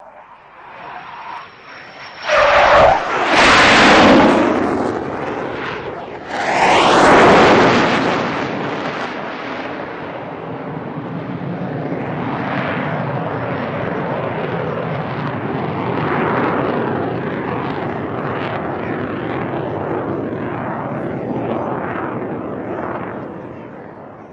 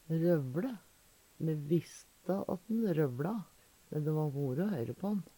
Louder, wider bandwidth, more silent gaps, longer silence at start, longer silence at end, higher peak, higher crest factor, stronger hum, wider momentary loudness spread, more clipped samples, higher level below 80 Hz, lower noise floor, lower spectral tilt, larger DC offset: first, -16 LUFS vs -35 LUFS; second, 10 kHz vs 18 kHz; neither; about the same, 0 s vs 0.1 s; second, 0 s vs 0.15 s; first, 0 dBFS vs -18 dBFS; about the same, 16 dB vs 16 dB; neither; first, 19 LU vs 11 LU; neither; first, -44 dBFS vs -72 dBFS; second, -41 dBFS vs -65 dBFS; second, -5 dB/octave vs -8.5 dB/octave; neither